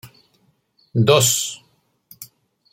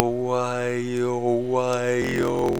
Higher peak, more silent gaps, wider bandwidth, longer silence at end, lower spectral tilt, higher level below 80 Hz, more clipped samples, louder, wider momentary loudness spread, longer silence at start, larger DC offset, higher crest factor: about the same, -2 dBFS vs 0 dBFS; neither; second, 16.5 kHz vs over 20 kHz; first, 0.5 s vs 0 s; second, -3.5 dB/octave vs -6 dB/octave; second, -60 dBFS vs -52 dBFS; neither; first, -17 LUFS vs -24 LUFS; first, 26 LU vs 2 LU; about the same, 0.05 s vs 0 s; second, under 0.1% vs 0.6%; about the same, 22 dB vs 22 dB